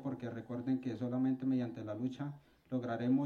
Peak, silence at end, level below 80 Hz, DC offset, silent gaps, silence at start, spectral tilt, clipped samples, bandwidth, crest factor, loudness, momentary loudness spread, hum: -22 dBFS; 0 s; -76 dBFS; under 0.1%; none; 0 s; -9 dB/octave; under 0.1%; 6.6 kHz; 14 dB; -38 LUFS; 10 LU; none